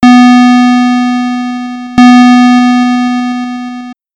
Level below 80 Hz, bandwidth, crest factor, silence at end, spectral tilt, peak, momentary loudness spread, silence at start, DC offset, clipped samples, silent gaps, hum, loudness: -44 dBFS; 8.6 kHz; 6 dB; 0.2 s; -4 dB/octave; 0 dBFS; 15 LU; 0 s; under 0.1%; under 0.1%; none; none; -6 LUFS